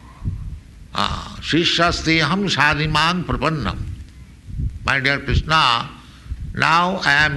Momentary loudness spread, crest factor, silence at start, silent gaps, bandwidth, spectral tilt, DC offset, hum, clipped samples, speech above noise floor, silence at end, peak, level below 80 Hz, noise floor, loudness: 17 LU; 16 dB; 0.05 s; none; 12 kHz; -4.5 dB/octave; under 0.1%; none; under 0.1%; 21 dB; 0 s; -2 dBFS; -32 dBFS; -39 dBFS; -18 LUFS